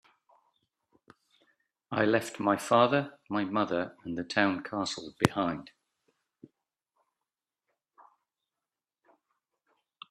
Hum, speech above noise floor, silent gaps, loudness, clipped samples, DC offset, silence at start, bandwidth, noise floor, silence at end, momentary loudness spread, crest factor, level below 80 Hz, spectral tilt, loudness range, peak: none; over 61 dB; none; -29 LUFS; under 0.1%; under 0.1%; 1.9 s; 13 kHz; under -90 dBFS; 4.45 s; 11 LU; 34 dB; -70 dBFS; -5 dB/octave; 8 LU; 0 dBFS